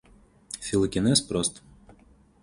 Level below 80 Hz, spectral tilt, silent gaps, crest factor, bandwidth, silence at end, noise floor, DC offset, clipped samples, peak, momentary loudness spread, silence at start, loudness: -50 dBFS; -4 dB/octave; none; 20 dB; 11.5 kHz; 0.5 s; -57 dBFS; under 0.1%; under 0.1%; -8 dBFS; 13 LU; 0.5 s; -25 LUFS